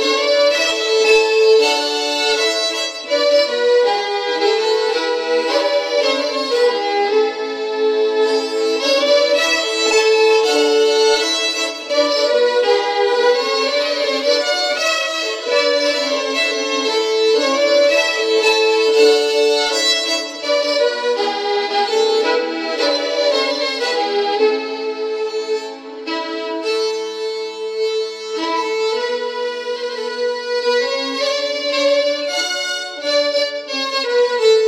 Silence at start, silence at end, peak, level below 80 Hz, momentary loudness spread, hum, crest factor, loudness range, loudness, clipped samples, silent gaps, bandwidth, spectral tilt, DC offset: 0 s; 0 s; 0 dBFS; -66 dBFS; 9 LU; none; 16 dB; 7 LU; -16 LUFS; under 0.1%; none; 14.5 kHz; 0.5 dB/octave; under 0.1%